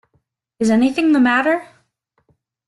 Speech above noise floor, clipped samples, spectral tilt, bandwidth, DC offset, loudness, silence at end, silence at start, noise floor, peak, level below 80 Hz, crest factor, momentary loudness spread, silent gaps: 51 dB; under 0.1%; -5 dB/octave; 12 kHz; under 0.1%; -16 LUFS; 1.05 s; 0.6 s; -66 dBFS; -4 dBFS; -60 dBFS; 16 dB; 7 LU; none